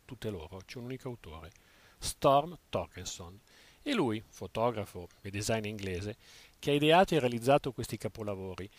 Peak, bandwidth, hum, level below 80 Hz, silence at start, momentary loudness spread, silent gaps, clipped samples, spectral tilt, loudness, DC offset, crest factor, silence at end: -12 dBFS; 15.5 kHz; none; -58 dBFS; 0.1 s; 18 LU; none; under 0.1%; -5 dB/octave; -32 LUFS; under 0.1%; 20 dB; 0.1 s